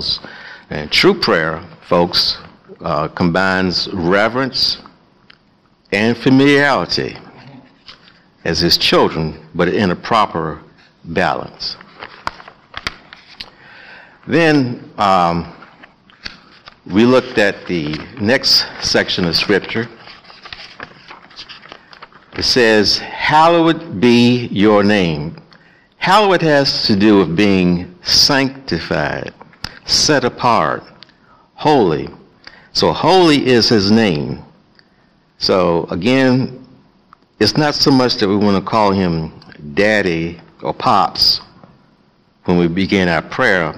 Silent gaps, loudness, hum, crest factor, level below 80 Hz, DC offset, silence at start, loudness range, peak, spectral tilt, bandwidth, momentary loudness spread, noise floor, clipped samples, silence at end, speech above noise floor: none; -14 LUFS; none; 14 dB; -46 dBFS; under 0.1%; 0 s; 6 LU; 0 dBFS; -4.5 dB/octave; 15 kHz; 19 LU; -54 dBFS; under 0.1%; 0 s; 40 dB